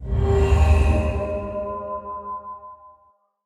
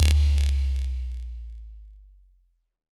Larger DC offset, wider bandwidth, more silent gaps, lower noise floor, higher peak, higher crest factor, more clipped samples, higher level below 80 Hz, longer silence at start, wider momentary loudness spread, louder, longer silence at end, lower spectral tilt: neither; second, 10.5 kHz vs 12 kHz; neither; second, -60 dBFS vs -65 dBFS; about the same, -6 dBFS vs -4 dBFS; about the same, 16 dB vs 20 dB; neither; about the same, -26 dBFS vs -26 dBFS; about the same, 0 s vs 0 s; second, 18 LU vs 22 LU; first, -22 LUFS vs -26 LUFS; second, 0.6 s vs 1 s; first, -8 dB/octave vs -4.5 dB/octave